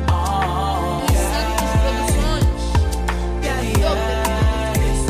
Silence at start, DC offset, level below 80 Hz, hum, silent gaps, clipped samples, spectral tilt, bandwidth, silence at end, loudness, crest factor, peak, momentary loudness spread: 0 s; under 0.1%; -22 dBFS; none; none; under 0.1%; -5 dB/octave; 16 kHz; 0 s; -20 LUFS; 12 dB; -6 dBFS; 3 LU